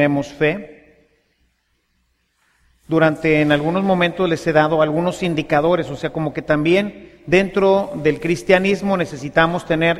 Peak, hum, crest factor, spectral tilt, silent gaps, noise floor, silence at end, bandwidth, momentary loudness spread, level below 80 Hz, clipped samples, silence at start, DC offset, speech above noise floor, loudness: 0 dBFS; none; 18 dB; -6.5 dB/octave; none; -66 dBFS; 0 s; 14 kHz; 7 LU; -46 dBFS; under 0.1%; 0 s; under 0.1%; 49 dB; -18 LUFS